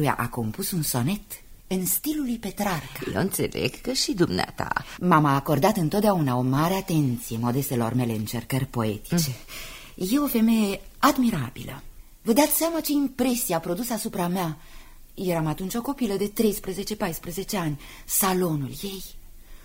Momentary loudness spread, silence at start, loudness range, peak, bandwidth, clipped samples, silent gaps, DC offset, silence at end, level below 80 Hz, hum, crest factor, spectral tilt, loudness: 11 LU; 0 s; 5 LU; -4 dBFS; 16.5 kHz; under 0.1%; none; under 0.1%; 0 s; -46 dBFS; none; 20 dB; -5 dB/octave; -25 LUFS